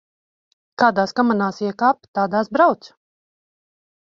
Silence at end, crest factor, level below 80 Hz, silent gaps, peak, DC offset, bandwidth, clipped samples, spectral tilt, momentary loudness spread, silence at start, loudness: 1.25 s; 20 dB; -66 dBFS; 2.08-2.14 s; -2 dBFS; under 0.1%; 7.4 kHz; under 0.1%; -6.5 dB/octave; 6 LU; 0.8 s; -19 LUFS